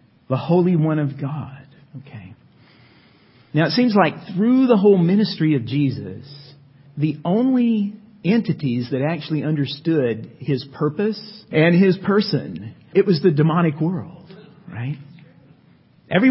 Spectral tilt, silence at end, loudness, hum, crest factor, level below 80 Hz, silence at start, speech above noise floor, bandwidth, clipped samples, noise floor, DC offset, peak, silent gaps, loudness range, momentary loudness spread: -11.5 dB/octave; 0 s; -19 LUFS; none; 18 dB; -60 dBFS; 0.3 s; 34 dB; 5.8 kHz; under 0.1%; -53 dBFS; under 0.1%; 0 dBFS; none; 5 LU; 17 LU